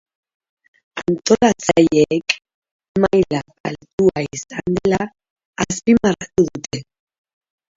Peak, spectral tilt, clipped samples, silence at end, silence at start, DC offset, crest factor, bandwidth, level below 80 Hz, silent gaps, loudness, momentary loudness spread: 0 dBFS; -5 dB/octave; under 0.1%; 0.95 s; 0.95 s; under 0.1%; 20 dB; 7.8 kHz; -48 dBFS; 2.54-2.62 s, 2.71-2.79 s, 2.88-2.95 s, 3.60-3.64 s, 3.93-3.98 s, 5.30-5.36 s, 5.45-5.53 s; -18 LUFS; 14 LU